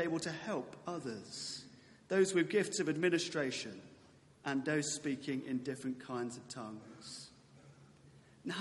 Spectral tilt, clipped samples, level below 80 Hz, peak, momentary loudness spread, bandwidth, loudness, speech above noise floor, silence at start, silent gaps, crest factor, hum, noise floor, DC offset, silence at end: -4 dB/octave; under 0.1%; -78 dBFS; -20 dBFS; 16 LU; 11.5 kHz; -38 LUFS; 26 dB; 0 s; none; 20 dB; none; -63 dBFS; under 0.1%; 0 s